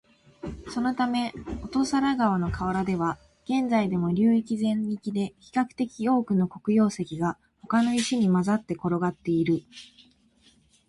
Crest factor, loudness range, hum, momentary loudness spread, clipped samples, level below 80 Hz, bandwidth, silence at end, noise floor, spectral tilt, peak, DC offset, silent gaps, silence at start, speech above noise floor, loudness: 16 dB; 2 LU; none; 9 LU; under 0.1%; -50 dBFS; 11.5 kHz; 1.05 s; -61 dBFS; -6.5 dB/octave; -10 dBFS; under 0.1%; none; 0.45 s; 36 dB; -26 LUFS